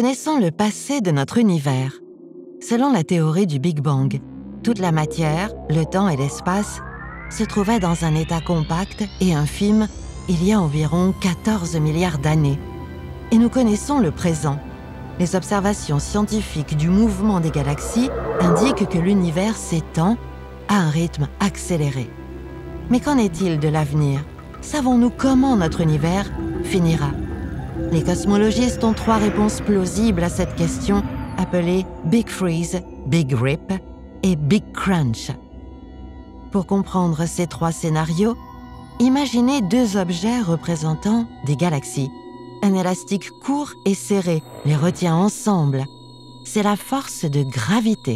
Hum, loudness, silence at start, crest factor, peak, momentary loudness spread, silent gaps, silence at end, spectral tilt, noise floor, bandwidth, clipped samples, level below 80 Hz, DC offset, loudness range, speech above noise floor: none; -20 LUFS; 0 s; 16 dB; -4 dBFS; 12 LU; none; 0 s; -6 dB/octave; -40 dBFS; 14.5 kHz; under 0.1%; -36 dBFS; under 0.1%; 3 LU; 22 dB